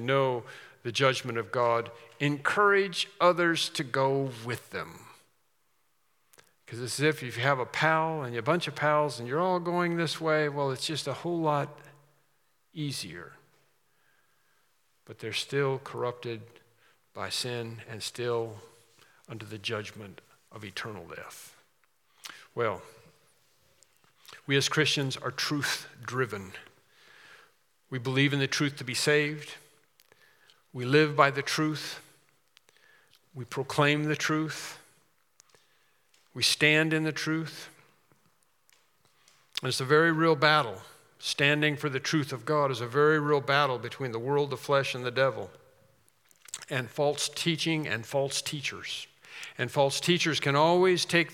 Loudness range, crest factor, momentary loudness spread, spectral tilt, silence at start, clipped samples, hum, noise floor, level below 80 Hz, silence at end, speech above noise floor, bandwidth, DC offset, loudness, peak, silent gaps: 11 LU; 26 dB; 19 LU; -4.5 dB/octave; 0 s; under 0.1%; none; -74 dBFS; -78 dBFS; 0 s; 46 dB; 17 kHz; under 0.1%; -28 LUFS; -6 dBFS; none